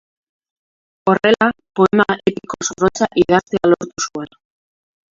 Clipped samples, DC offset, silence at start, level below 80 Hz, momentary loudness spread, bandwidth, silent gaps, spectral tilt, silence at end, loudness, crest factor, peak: under 0.1%; under 0.1%; 1.05 s; -50 dBFS; 10 LU; 7.6 kHz; none; -4.5 dB/octave; 0.85 s; -16 LUFS; 18 dB; 0 dBFS